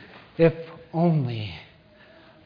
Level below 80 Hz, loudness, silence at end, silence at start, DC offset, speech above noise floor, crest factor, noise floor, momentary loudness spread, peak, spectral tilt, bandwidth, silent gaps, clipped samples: -56 dBFS; -24 LUFS; 0.8 s; 0 s; under 0.1%; 30 dB; 20 dB; -53 dBFS; 18 LU; -6 dBFS; -10.5 dB/octave; 5.2 kHz; none; under 0.1%